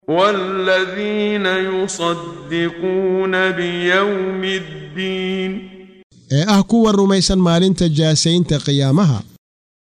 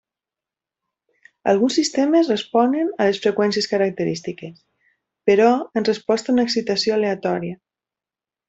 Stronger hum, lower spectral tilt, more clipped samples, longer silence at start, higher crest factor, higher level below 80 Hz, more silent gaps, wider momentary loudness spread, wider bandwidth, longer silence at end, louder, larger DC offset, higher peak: neither; about the same, -5 dB/octave vs -4.5 dB/octave; neither; second, 0.1 s vs 1.45 s; about the same, 14 dB vs 18 dB; first, -42 dBFS vs -64 dBFS; first, 6.03-6.10 s vs none; about the same, 9 LU vs 9 LU; first, 11 kHz vs 8.2 kHz; second, 0.6 s vs 0.95 s; about the same, -17 LUFS vs -19 LUFS; neither; about the same, -2 dBFS vs -4 dBFS